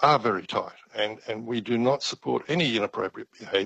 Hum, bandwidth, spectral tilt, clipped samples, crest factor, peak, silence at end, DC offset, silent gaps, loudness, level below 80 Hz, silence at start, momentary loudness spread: none; 8.6 kHz; -5 dB/octave; under 0.1%; 20 dB; -6 dBFS; 0 s; under 0.1%; none; -27 LUFS; -68 dBFS; 0 s; 10 LU